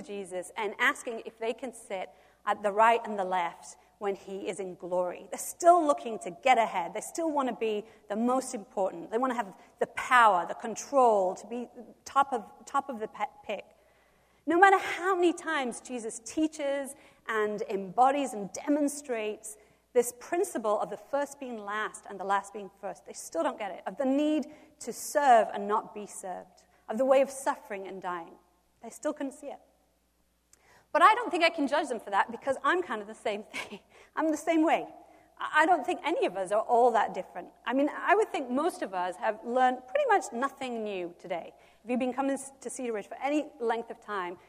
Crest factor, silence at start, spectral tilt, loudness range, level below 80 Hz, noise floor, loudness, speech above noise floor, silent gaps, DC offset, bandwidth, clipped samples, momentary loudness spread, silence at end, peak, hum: 22 dB; 0 s; -3.5 dB/octave; 6 LU; -74 dBFS; -71 dBFS; -29 LUFS; 42 dB; none; under 0.1%; 15.5 kHz; under 0.1%; 16 LU; 0.1 s; -8 dBFS; none